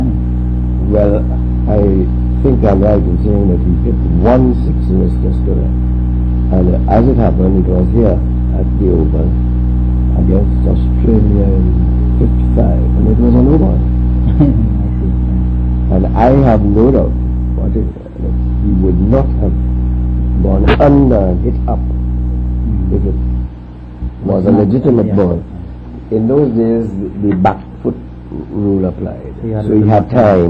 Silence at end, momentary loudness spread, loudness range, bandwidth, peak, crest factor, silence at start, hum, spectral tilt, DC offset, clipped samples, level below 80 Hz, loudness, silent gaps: 0 s; 9 LU; 3 LU; 4.1 kHz; 0 dBFS; 10 dB; 0 s; none; -11.5 dB/octave; under 0.1%; under 0.1%; -14 dBFS; -12 LUFS; none